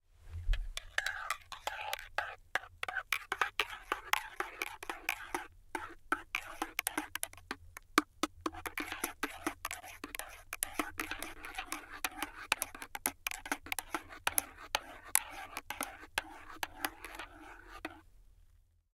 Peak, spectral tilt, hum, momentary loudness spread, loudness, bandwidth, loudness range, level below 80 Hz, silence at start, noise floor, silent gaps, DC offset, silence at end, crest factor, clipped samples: -4 dBFS; -1.5 dB/octave; none; 11 LU; -39 LUFS; 17 kHz; 3 LU; -50 dBFS; 0.15 s; -66 dBFS; none; under 0.1%; 0.35 s; 38 dB; under 0.1%